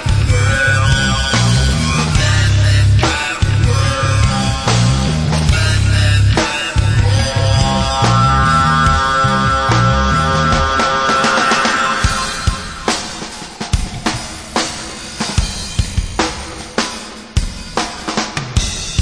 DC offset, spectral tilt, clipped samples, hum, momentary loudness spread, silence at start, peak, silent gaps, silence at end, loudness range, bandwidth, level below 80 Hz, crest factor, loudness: 0.2%; -4.5 dB/octave; under 0.1%; none; 9 LU; 0 s; -2 dBFS; none; 0 s; 8 LU; 11 kHz; -22 dBFS; 12 dB; -14 LUFS